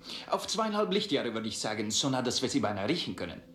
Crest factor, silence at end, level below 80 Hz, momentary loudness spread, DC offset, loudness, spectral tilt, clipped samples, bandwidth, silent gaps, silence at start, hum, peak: 16 dB; 0 s; -66 dBFS; 5 LU; under 0.1%; -31 LUFS; -3.5 dB/octave; under 0.1%; 15.5 kHz; none; 0 s; none; -16 dBFS